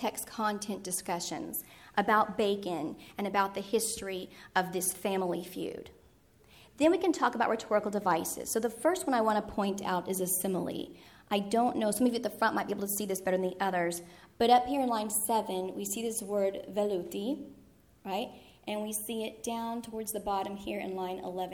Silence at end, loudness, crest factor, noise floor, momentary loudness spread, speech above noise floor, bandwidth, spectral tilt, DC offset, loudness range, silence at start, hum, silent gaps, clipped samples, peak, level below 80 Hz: 0 s; -32 LUFS; 22 dB; -62 dBFS; 10 LU; 30 dB; 19.5 kHz; -3.5 dB/octave; under 0.1%; 6 LU; 0 s; none; none; under 0.1%; -10 dBFS; -64 dBFS